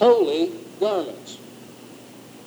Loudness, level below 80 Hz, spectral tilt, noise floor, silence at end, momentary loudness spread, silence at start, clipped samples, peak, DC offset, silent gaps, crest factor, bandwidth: -23 LUFS; -78 dBFS; -5 dB/octave; -44 dBFS; 0.1 s; 24 LU; 0 s; under 0.1%; -4 dBFS; under 0.1%; none; 18 dB; over 20 kHz